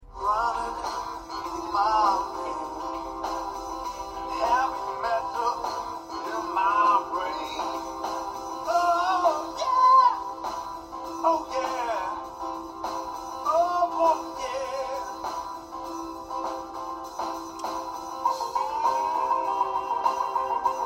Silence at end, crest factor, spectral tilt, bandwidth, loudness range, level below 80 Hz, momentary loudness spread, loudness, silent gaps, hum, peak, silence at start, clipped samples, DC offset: 0 s; 18 dB; -3 dB/octave; 16 kHz; 7 LU; -54 dBFS; 12 LU; -27 LUFS; none; none; -10 dBFS; 0 s; under 0.1%; under 0.1%